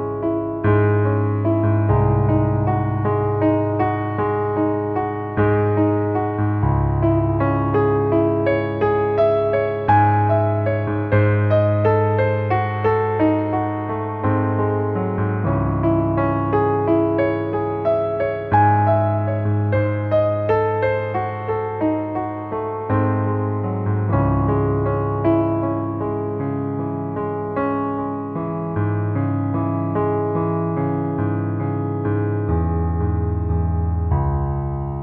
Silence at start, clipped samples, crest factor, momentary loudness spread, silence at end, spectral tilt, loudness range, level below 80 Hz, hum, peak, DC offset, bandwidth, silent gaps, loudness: 0 s; under 0.1%; 16 dB; 7 LU; 0 s; -12 dB/octave; 4 LU; -34 dBFS; none; -4 dBFS; under 0.1%; 4.3 kHz; none; -20 LUFS